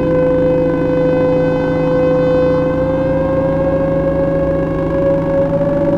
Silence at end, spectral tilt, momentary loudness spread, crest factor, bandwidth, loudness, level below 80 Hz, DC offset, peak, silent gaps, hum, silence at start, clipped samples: 0 s; -9.5 dB/octave; 2 LU; 10 dB; 6.4 kHz; -14 LUFS; -30 dBFS; under 0.1%; -2 dBFS; none; none; 0 s; under 0.1%